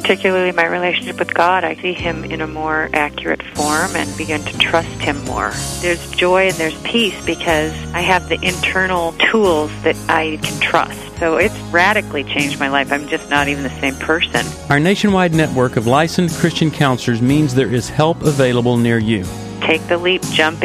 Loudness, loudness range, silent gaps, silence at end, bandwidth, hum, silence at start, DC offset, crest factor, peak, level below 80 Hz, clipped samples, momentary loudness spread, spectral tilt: -16 LUFS; 3 LU; none; 0 s; 15.5 kHz; none; 0 s; under 0.1%; 16 dB; 0 dBFS; -38 dBFS; under 0.1%; 6 LU; -4.5 dB/octave